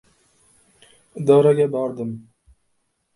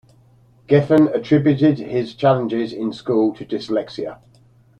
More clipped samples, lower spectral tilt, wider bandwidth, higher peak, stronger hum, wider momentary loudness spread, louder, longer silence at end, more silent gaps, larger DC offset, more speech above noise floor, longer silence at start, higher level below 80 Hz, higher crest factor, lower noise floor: neither; about the same, -8 dB/octave vs -8.5 dB/octave; first, 11.5 kHz vs 8 kHz; about the same, -2 dBFS vs -2 dBFS; neither; first, 21 LU vs 12 LU; about the same, -19 LUFS vs -18 LUFS; first, 0.95 s vs 0.65 s; neither; neither; first, 52 dB vs 34 dB; first, 1.15 s vs 0.7 s; second, -64 dBFS vs -56 dBFS; about the same, 20 dB vs 16 dB; first, -70 dBFS vs -52 dBFS